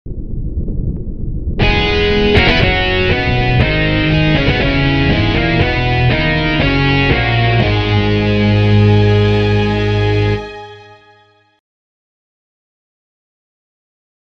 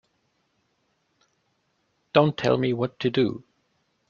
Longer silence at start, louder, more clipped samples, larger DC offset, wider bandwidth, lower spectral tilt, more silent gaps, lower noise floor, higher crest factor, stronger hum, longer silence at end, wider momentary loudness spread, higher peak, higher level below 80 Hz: second, 0.05 s vs 2.15 s; first, -13 LUFS vs -24 LUFS; neither; first, 0.5% vs under 0.1%; about the same, 6.6 kHz vs 7.2 kHz; about the same, -7.5 dB/octave vs -7 dB/octave; neither; second, -50 dBFS vs -72 dBFS; second, 14 dB vs 26 dB; neither; first, 3.4 s vs 0.7 s; first, 12 LU vs 5 LU; about the same, 0 dBFS vs -2 dBFS; first, -22 dBFS vs -62 dBFS